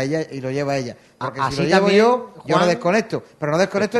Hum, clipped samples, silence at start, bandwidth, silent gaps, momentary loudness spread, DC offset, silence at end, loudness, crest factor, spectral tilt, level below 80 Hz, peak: none; under 0.1%; 0 s; 12.5 kHz; none; 13 LU; under 0.1%; 0 s; -19 LUFS; 18 dB; -5.5 dB/octave; -56 dBFS; -2 dBFS